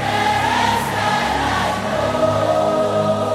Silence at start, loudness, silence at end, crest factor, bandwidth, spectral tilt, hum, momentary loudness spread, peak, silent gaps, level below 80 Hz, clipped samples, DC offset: 0 s; -18 LUFS; 0 s; 14 dB; 16 kHz; -4.5 dB/octave; none; 3 LU; -4 dBFS; none; -40 dBFS; under 0.1%; under 0.1%